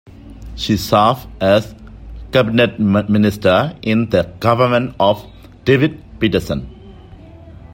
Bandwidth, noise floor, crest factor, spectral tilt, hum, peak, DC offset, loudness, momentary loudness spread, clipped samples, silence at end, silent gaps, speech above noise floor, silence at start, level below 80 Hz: 16.5 kHz; -38 dBFS; 16 dB; -6.5 dB/octave; none; 0 dBFS; under 0.1%; -16 LUFS; 12 LU; under 0.1%; 0 s; none; 23 dB; 0.25 s; -38 dBFS